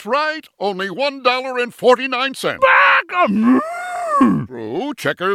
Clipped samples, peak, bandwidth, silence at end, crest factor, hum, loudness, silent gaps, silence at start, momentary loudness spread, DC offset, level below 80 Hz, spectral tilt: under 0.1%; 0 dBFS; 14.5 kHz; 0 s; 16 dB; none; -16 LUFS; none; 0 s; 12 LU; under 0.1%; -58 dBFS; -5 dB/octave